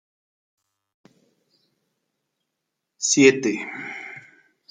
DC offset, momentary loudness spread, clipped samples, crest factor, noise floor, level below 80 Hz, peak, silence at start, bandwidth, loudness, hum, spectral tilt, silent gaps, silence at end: under 0.1%; 22 LU; under 0.1%; 24 dB; -81 dBFS; -74 dBFS; -2 dBFS; 3 s; 9.6 kHz; -20 LUFS; none; -3 dB/octave; none; 0.5 s